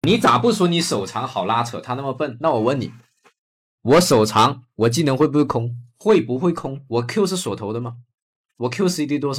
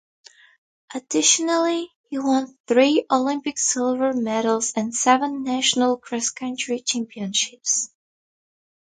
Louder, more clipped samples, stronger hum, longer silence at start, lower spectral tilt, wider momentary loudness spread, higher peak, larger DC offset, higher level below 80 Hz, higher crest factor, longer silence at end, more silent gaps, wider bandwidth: about the same, -20 LUFS vs -21 LUFS; neither; neither; second, 0.05 s vs 0.9 s; first, -5.5 dB/octave vs -1.5 dB/octave; about the same, 11 LU vs 9 LU; about the same, -6 dBFS vs -4 dBFS; neither; first, -56 dBFS vs -70 dBFS; about the same, 14 dB vs 18 dB; second, 0 s vs 1.15 s; first, 3.38-3.78 s, 8.14-8.44 s vs 1.96-2.04 s, 2.60-2.64 s; first, 16.5 kHz vs 9.6 kHz